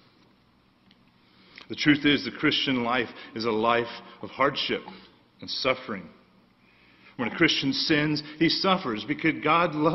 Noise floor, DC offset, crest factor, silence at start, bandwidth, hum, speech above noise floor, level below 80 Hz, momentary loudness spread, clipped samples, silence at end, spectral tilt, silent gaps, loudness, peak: -62 dBFS; under 0.1%; 22 dB; 1.7 s; 6.2 kHz; none; 36 dB; -60 dBFS; 14 LU; under 0.1%; 0 s; -5.5 dB/octave; none; -25 LUFS; -6 dBFS